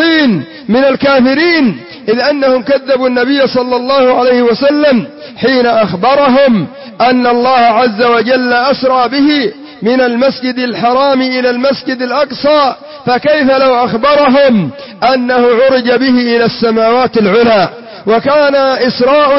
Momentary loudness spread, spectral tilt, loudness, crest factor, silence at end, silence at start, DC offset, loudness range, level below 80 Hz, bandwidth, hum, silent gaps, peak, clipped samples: 6 LU; -8.5 dB/octave; -9 LUFS; 8 dB; 0 s; 0 s; under 0.1%; 2 LU; -48 dBFS; 5.8 kHz; none; none; 0 dBFS; under 0.1%